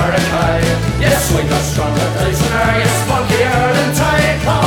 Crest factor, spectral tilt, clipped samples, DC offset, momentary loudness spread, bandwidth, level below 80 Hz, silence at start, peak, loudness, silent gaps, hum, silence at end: 12 dB; -5 dB/octave; under 0.1%; under 0.1%; 3 LU; 20 kHz; -26 dBFS; 0 s; 0 dBFS; -14 LUFS; none; none; 0 s